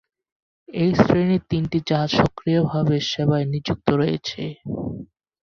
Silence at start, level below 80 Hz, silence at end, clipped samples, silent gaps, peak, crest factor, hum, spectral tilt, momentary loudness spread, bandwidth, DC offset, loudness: 0.7 s; -48 dBFS; 0.4 s; under 0.1%; none; -2 dBFS; 20 dB; none; -7 dB/octave; 12 LU; 7 kHz; under 0.1%; -21 LUFS